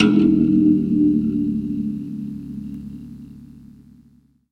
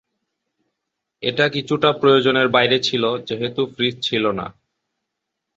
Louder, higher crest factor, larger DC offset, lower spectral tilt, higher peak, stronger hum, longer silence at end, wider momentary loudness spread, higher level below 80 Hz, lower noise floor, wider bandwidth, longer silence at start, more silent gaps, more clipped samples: about the same, -19 LUFS vs -18 LUFS; about the same, 18 dB vs 20 dB; neither; first, -8.5 dB/octave vs -5 dB/octave; about the same, -2 dBFS vs -2 dBFS; first, 60 Hz at -55 dBFS vs none; about the same, 0.95 s vs 1.05 s; first, 21 LU vs 9 LU; first, -46 dBFS vs -60 dBFS; second, -55 dBFS vs -80 dBFS; second, 6 kHz vs 8 kHz; second, 0 s vs 1.2 s; neither; neither